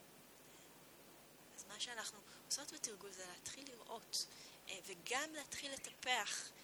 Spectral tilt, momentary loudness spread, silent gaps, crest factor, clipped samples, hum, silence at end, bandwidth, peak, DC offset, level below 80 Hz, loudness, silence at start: 0 dB/octave; 20 LU; none; 26 dB; under 0.1%; none; 0 s; over 20 kHz; -22 dBFS; under 0.1%; -82 dBFS; -45 LUFS; 0 s